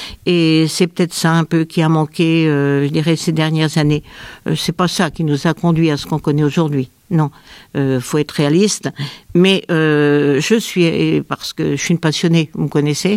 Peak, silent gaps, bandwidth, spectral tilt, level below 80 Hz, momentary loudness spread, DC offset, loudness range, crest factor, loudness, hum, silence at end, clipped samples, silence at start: 0 dBFS; none; 15.5 kHz; -5.5 dB/octave; -48 dBFS; 7 LU; under 0.1%; 3 LU; 14 dB; -15 LUFS; none; 0 s; under 0.1%; 0 s